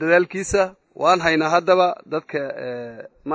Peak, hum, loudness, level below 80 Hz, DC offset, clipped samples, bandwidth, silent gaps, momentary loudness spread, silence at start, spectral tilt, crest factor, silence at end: -4 dBFS; none; -20 LUFS; -50 dBFS; under 0.1%; under 0.1%; 8 kHz; none; 14 LU; 0 s; -4.5 dB/octave; 18 dB; 0 s